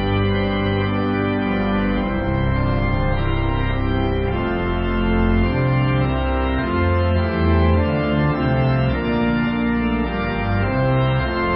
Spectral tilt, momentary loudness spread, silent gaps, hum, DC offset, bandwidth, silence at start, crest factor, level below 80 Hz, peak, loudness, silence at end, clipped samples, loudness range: -12.5 dB/octave; 3 LU; none; none; under 0.1%; 5.6 kHz; 0 s; 14 dB; -26 dBFS; -6 dBFS; -20 LUFS; 0 s; under 0.1%; 2 LU